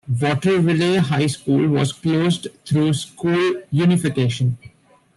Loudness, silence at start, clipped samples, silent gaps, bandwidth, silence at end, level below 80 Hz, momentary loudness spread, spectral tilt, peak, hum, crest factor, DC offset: -19 LUFS; 0.05 s; under 0.1%; none; 12.5 kHz; 0.5 s; -54 dBFS; 6 LU; -6.5 dB/octave; -6 dBFS; none; 12 dB; under 0.1%